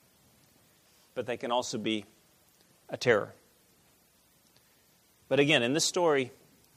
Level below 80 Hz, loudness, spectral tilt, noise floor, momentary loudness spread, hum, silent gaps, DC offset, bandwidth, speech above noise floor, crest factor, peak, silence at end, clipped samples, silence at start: -74 dBFS; -29 LUFS; -3.5 dB/octave; -65 dBFS; 15 LU; none; none; under 0.1%; 15.5 kHz; 37 dB; 24 dB; -10 dBFS; 0.45 s; under 0.1%; 1.15 s